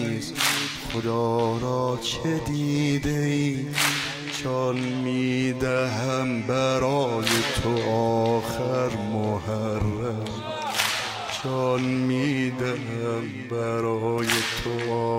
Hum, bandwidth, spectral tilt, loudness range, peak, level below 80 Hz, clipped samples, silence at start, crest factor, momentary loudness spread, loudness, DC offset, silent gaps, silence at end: none; 16 kHz; -4.5 dB/octave; 2 LU; -4 dBFS; -48 dBFS; under 0.1%; 0 s; 22 dB; 6 LU; -25 LUFS; under 0.1%; none; 0 s